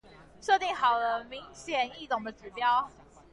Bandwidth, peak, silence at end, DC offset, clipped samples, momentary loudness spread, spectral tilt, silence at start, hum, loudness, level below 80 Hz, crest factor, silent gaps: 11.5 kHz; -14 dBFS; 0.45 s; under 0.1%; under 0.1%; 15 LU; -2.5 dB/octave; 0.2 s; none; -29 LUFS; -62 dBFS; 18 dB; none